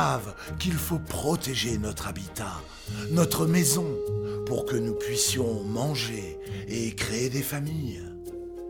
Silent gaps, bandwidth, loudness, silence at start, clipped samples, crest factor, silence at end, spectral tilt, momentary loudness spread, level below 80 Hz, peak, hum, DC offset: none; over 20 kHz; -28 LUFS; 0 s; under 0.1%; 18 dB; 0 s; -4.5 dB/octave; 13 LU; -48 dBFS; -10 dBFS; none; under 0.1%